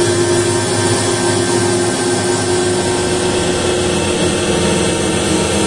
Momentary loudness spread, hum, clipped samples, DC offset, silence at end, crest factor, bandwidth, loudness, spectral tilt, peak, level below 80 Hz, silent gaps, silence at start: 1 LU; none; under 0.1%; 0.3%; 0 s; 14 dB; 11.5 kHz; -14 LUFS; -4 dB/octave; -2 dBFS; -38 dBFS; none; 0 s